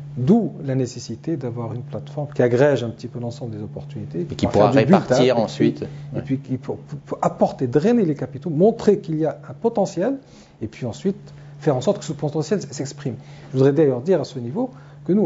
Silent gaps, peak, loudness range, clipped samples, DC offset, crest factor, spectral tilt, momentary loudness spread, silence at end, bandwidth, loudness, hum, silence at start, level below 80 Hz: none; 0 dBFS; 5 LU; under 0.1%; under 0.1%; 20 dB; -7 dB/octave; 15 LU; 0 s; 8 kHz; -21 LUFS; none; 0 s; -54 dBFS